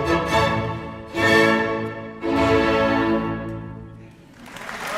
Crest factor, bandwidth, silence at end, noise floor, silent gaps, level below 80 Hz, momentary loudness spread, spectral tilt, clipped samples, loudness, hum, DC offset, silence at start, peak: 16 dB; 16 kHz; 0 s; -43 dBFS; none; -42 dBFS; 19 LU; -5.5 dB/octave; under 0.1%; -20 LUFS; none; under 0.1%; 0 s; -4 dBFS